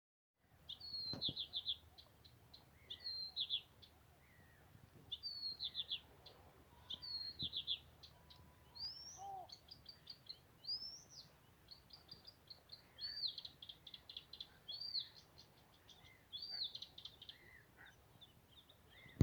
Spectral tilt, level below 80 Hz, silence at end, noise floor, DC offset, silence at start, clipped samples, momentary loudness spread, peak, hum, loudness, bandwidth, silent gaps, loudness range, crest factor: -3.5 dB/octave; -74 dBFS; 0 s; -68 dBFS; under 0.1%; 0.5 s; under 0.1%; 22 LU; -18 dBFS; none; -47 LUFS; over 20 kHz; none; 6 LU; 32 dB